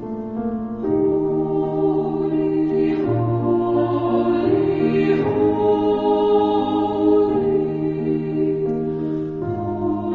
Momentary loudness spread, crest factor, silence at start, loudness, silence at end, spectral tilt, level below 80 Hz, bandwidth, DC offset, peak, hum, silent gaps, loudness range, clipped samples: 7 LU; 14 dB; 0 s; -20 LUFS; 0 s; -10 dB/octave; -48 dBFS; 4.8 kHz; under 0.1%; -6 dBFS; none; none; 3 LU; under 0.1%